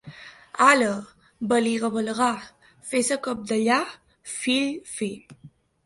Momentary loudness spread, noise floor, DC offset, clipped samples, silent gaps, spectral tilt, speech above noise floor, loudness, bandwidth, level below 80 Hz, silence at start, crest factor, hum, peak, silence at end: 19 LU; -45 dBFS; under 0.1%; under 0.1%; none; -3 dB/octave; 21 dB; -24 LUFS; 11.5 kHz; -66 dBFS; 0.05 s; 22 dB; none; -2 dBFS; 0.35 s